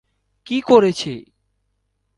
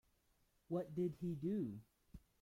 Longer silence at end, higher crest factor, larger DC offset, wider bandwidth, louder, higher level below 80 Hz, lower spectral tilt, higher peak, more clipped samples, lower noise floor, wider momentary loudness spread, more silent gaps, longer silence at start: first, 0.95 s vs 0.2 s; about the same, 20 dB vs 16 dB; neither; second, 11.5 kHz vs 15.5 kHz; first, -17 LUFS vs -44 LUFS; first, -60 dBFS vs -72 dBFS; second, -5.5 dB/octave vs -10 dB/octave; first, 0 dBFS vs -30 dBFS; neither; second, -70 dBFS vs -78 dBFS; second, 16 LU vs 22 LU; neither; second, 0.5 s vs 0.7 s